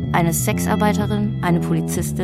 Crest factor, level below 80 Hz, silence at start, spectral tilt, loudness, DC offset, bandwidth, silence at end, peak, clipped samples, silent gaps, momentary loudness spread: 16 dB; -40 dBFS; 0 s; -5.5 dB/octave; -19 LUFS; under 0.1%; 16 kHz; 0 s; -4 dBFS; under 0.1%; none; 3 LU